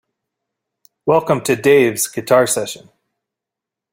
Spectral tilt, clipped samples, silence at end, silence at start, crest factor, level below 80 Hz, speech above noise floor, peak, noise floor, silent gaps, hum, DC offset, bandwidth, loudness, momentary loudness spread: -4 dB/octave; under 0.1%; 1.15 s; 1.05 s; 16 dB; -58 dBFS; 70 dB; -2 dBFS; -85 dBFS; none; none; under 0.1%; 16.5 kHz; -15 LUFS; 12 LU